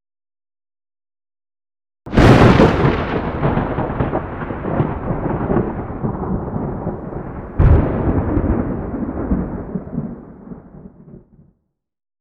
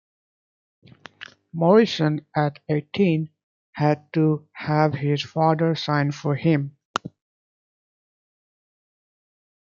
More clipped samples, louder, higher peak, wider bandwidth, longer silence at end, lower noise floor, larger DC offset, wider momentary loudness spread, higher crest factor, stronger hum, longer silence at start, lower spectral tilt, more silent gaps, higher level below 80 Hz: neither; first, -18 LUFS vs -22 LUFS; first, 0 dBFS vs -4 dBFS; first, 10.5 kHz vs 7.4 kHz; second, 1.05 s vs 2.7 s; first, -68 dBFS vs -44 dBFS; neither; about the same, 17 LU vs 18 LU; about the same, 18 dB vs 20 dB; neither; first, 2.05 s vs 1.2 s; about the same, -8 dB/octave vs -7.5 dB/octave; second, none vs 3.43-3.73 s, 6.85-6.94 s; first, -26 dBFS vs -66 dBFS